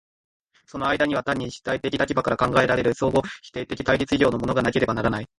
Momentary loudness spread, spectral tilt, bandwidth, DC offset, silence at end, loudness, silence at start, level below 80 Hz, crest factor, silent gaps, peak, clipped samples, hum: 8 LU; -6 dB/octave; 11.5 kHz; under 0.1%; 0.15 s; -23 LUFS; 0.75 s; -46 dBFS; 18 dB; none; -4 dBFS; under 0.1%; none